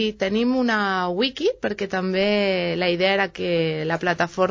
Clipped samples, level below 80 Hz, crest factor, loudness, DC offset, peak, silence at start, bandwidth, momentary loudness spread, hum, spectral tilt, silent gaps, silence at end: under 0.1%; -54 dBFS; 16 dB; -22 LUFS; under 0.1%; -6 dBFS; 0 s; 7.6 kHz; 4 LU; none; -5.5 dB/octave; none; 0 s